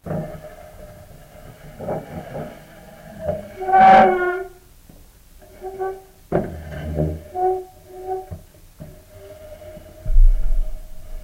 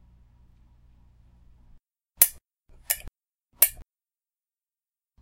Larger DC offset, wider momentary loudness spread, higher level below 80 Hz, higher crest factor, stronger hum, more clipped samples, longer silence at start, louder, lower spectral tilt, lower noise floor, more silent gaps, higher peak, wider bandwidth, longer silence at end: neither; first, 26 LU vs 9 LU; first, -24 dBFS vs -54 dBFS; second, 18 dB vs 30 dB; neither; neither; second, 0.05 s vs 2.2 s; about the same, -20 LUFS vs -22 LUFS; first, -7 dB/octave vs 1.5 dB/octave; second, -46 dBFS vs under -90 dBFS; neither; about the same, -2 dBFS vs -2 dBFS; about the same, 15 kHz vs 16 kHz; second, 0.05 s vs 1.4 s